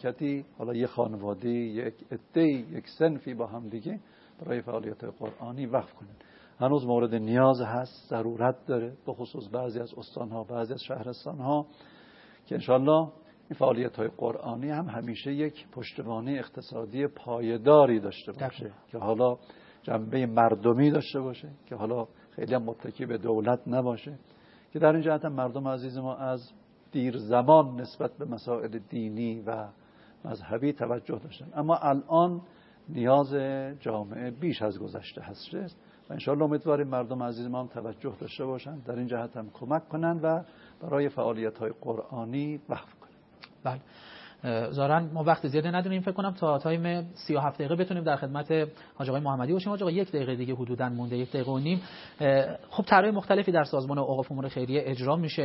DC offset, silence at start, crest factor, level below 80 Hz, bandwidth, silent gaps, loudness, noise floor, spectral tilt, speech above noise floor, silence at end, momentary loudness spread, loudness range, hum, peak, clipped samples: under 0.1%; 0 s; 24 dB; -72 dBFS; 5.8 kHz; none; -29 LUFS; -55 dBFS; -11 dB/octave; 26 dB; 0 s; 15 LU; 7 LU; none; -4 dBFS; under 0.1%